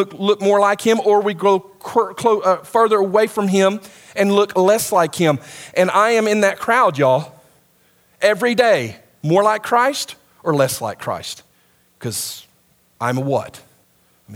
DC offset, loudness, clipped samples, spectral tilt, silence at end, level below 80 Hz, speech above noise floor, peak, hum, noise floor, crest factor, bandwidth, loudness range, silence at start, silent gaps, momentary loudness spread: under 0.1%; -17 LUFS; under 0.1%; -4.5 dB/octave; 0 s; -64 dBFS; 41 dB; 0 dBFS; none; -57 dBFS; 18 dB; 17 kHz; 8 LU; 0 s; none; 13 LU